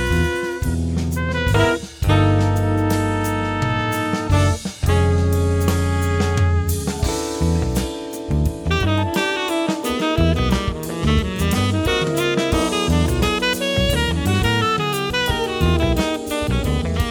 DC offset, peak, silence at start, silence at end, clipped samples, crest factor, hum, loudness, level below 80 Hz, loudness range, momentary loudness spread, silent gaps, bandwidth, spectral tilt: under 0.1%; -4 dBFS; 0 s; 0 s; under 0.1%; 16 dB; none; -19 LUFS; -28 dBFS; 2 LU; 5 LU; none; over 20 kHz; -5.5 dB/octave